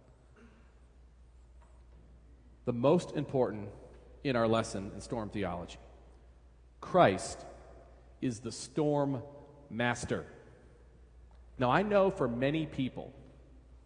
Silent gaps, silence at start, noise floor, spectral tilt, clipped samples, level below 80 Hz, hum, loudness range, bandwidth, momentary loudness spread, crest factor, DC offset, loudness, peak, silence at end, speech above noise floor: none; 0.4 s; -59 dBFS; -6 dB/octave; under 0.1%; -58 dBFS; none; 4 LU; 10.5 kHz; 23 LU; 24 dB; under 0.1%; -32 LUFS; -10 dBFS; 0.1 s; 27 dB